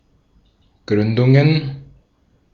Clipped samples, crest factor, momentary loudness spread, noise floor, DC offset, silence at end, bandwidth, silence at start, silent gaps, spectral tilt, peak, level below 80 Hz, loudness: under 0.1%; 18 dB; 17 LU; -59 dBFS; under 0.1%; 0.7 s; 6.6 kHz; 0.9 s; none; -9 dB/octave; -2 dBFS; -52 dBFS; -16 LUFS